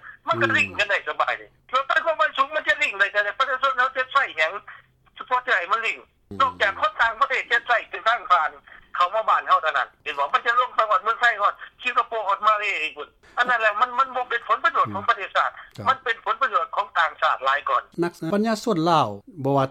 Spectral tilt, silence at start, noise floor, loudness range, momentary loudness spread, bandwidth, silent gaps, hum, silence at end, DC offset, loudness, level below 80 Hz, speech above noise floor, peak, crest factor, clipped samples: -4.5 dB/octave; 0.05 s; -48 dBFS; 2 LU; 7 LU; 14.5 kHz; none; none; 0 s; under 0.1%; -22 LUFS; -62 dBFS; 25 dB; -6 dBFS; 18 dB; under 0.1%